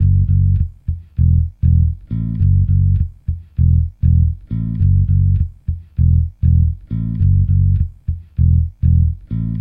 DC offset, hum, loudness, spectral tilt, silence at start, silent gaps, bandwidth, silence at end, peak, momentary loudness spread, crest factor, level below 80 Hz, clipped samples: under 0.1%; none; -16 LUFS; -13 dB/octave; 0 s; none; 0.6 kHz; 0 s; -4 dBFS; 9 LU; 12 dB; -20 dBFS; under 0.1%